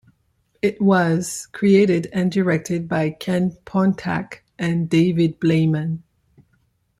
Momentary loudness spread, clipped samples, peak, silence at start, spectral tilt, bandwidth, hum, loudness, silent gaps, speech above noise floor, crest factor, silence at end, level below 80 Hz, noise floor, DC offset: 10 LU; under 0.1%; -4 dBFS; 0.65 s; -6.5 dB/octave; 14.5 kHz; none; -20 LUFS; none; 46 dB; 16 dB; 1 s; -56 dBFS; -65 dBFS; under 0.1%